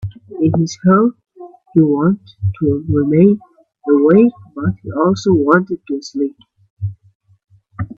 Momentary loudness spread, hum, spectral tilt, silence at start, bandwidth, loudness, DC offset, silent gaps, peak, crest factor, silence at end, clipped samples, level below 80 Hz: 15 LU; none; -8 dB/octave; 0 s; 7.6 kHz; -15 LUFS; under 0.1%; 6.70-6.77 s, 7.15-7.20 s; 0 dBFS; 16 dB; 0.05 s; under 0.1%; -48 dBFS